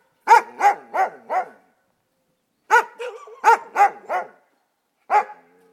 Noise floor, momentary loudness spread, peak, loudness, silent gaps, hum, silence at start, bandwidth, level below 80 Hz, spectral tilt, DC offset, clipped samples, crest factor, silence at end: -70 dBFS; 19 LU; 0 dBFS; -19 LUFS; none; none; 0.25 s; 15 kHz; under -90 dBFS; -0.5 dB/octave; under 0.1%; under 0.1%; 20 dB; 0.4 s